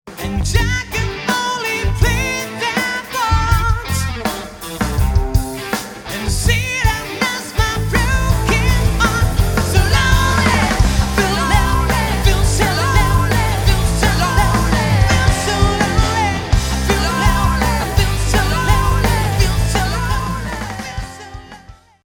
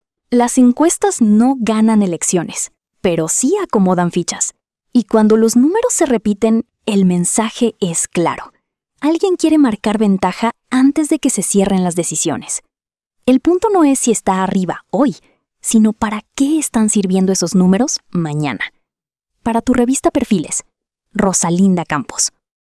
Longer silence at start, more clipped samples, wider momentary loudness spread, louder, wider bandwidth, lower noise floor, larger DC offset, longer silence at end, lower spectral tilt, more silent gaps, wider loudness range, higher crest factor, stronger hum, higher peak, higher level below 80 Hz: second, 0.05 s vs 0.3 s; neither; about the same, 8 LU vs 8 LU; about the same, -16 LUFS vs -15 LUFS; first, over 20 kHz vs 12 kHz; second, -41 dBFS vs -86 dBFS; neither; second, 0.3 s vs 0.45 s; about the same, -4.5 dB/octave vs -5 dB/octave; neither; about the same, 4 LU vs 2 LU; about the same, 16 dB vs 14 dB; neither; about the same, 0 dBFS vs -2 dBFS; first, -20 dBFS vs -48 dBFS